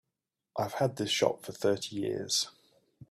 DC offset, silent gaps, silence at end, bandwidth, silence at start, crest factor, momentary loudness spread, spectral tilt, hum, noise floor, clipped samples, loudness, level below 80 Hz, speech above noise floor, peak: under 0.1%; none; 0.1 s; 15.5 kHz; 0.55 s; 22 dB; 8 LU; -3.5 dB/octave; none; -88 dBFS; under 0.1%; -32 LUFS; -72 dBFS; 56 dB; -12 dBFS